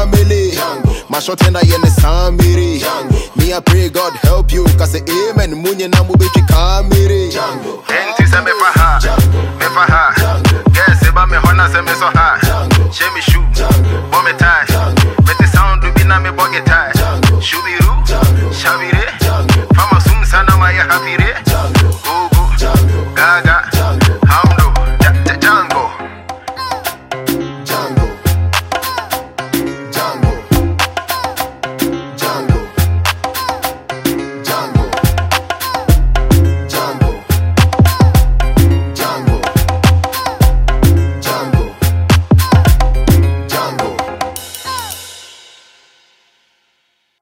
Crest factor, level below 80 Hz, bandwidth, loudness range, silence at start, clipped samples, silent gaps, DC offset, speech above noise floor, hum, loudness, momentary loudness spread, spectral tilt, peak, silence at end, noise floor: 10 dB; -16 dBFS; 16.5 kHz; 7 LU; 0 s; under 0.1%; none; under 0.1%; 52 dB; none; -12 LUFS; 9 LU; -5.5 dB/octave; 0 dBFS; 1.95 s; -62 dBFS